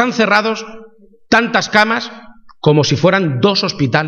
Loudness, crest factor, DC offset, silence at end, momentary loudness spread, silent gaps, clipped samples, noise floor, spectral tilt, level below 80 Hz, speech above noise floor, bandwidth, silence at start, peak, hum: -13 LUFS; 14 dB; under 0.1%; 0 s; 8 LU; none; under 0.1%; -43 dBFS; -5 dB/octave; -50 dBFS; 30 dB; 9 kHz; 0 s; 0 dBFS; none